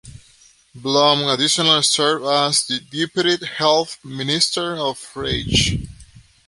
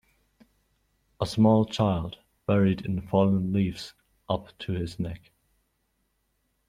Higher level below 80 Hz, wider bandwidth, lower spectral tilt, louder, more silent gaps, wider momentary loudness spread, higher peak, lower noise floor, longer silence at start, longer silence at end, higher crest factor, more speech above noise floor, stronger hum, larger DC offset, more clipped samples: first, -40 dBFS vs -54 dBFS; about the same, 11.5 kHz vs 11.5 kHz; second, -3 dB/octave vs -7.5 dB/octave; first, -18 LUFS vs -27 LUFS; neither; second, 12 LU vs 15 LU; first, 0 dBFS vs -8 dBFS; second, -52 dBFS vs -74 dBFS; second, 0.05 s vs 1.2 s; second, 0.3 s vs 1.5 s; about the same, 20 dB vs 20 dB; second, 33 dB vs 49 dB; neither; neither; neither